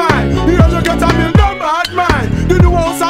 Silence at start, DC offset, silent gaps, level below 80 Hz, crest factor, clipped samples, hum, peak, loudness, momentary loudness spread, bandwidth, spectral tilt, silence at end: 0 s; under 0.1%; none; -18 dBFS; 10 dB; 1%; none; 0 dBFS; -11 LUFS; 4 LU; 16 kHz; -6 dB/octave; 0 s